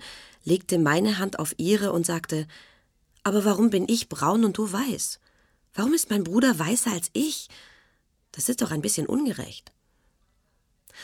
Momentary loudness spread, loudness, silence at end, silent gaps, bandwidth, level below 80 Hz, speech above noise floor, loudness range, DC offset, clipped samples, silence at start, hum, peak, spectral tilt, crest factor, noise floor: 15 LU; -25 LUFS; 0 s; none; 18 kHz; -62 dBFS; 44 dB; 5 LU; under 0.1%; under 0.1%; 0 s; none; -8 dBFS; -4 dB/octave; 18 dB; -69 dBFS